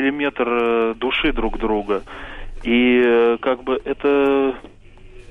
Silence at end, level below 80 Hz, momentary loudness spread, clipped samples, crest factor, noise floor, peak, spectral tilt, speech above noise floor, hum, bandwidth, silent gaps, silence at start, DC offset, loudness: 0 s; -34 dBFS; 13 LU; under 0.1%; 12 dB; -41 dBFS; -8 dBFS; -6.5 dB/octave; 22 dB; none; 5.6 kHz; none; 0 s; under 0.1%; -19 LUFS